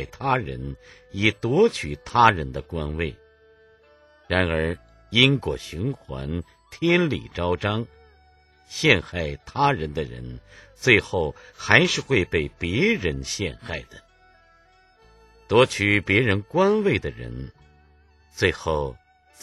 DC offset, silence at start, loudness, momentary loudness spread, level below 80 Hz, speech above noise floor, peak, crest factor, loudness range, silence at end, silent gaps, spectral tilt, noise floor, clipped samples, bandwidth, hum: under 0.1%; 0 s; -22 LUFS; 17 LU; -42 dBFS; 34 dB; 0 dBFS; 24 dB; 4 LU; 0.5 s; none; -5 dB/octave; -57 dBFS; under 0.1%; 12.5 kHz; none